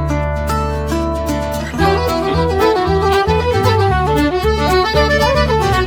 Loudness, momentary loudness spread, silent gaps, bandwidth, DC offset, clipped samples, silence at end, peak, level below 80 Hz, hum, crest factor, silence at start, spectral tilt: -15 LUFS; 6 LU; none; 19.5 kHz; under 0.1%; under 0.1%; 0 s; 0 dBFS; -24 dBFS; none; 14 dB; 0 s; -6 dB/octave